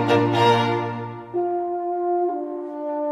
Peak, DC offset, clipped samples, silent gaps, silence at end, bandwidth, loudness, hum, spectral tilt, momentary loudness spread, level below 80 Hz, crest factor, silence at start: -6 dBFS; under 0.1%; under 0.1%; none; 0 s; 11.5 kHz; -23 LUFS; none; -6.5 dB/octave; 12 LU; -66 dBFS; 16 dB; 0 s